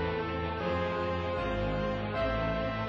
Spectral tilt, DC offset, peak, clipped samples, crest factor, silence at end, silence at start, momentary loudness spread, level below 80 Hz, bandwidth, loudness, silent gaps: -7.5 dB/octave; under 0.1%; -20 dBFS; under 0.1%; 12 dB; 0 s; 0 s; 2 LU; -42 dBFS; 7.2 kHz; -32 LUFS; none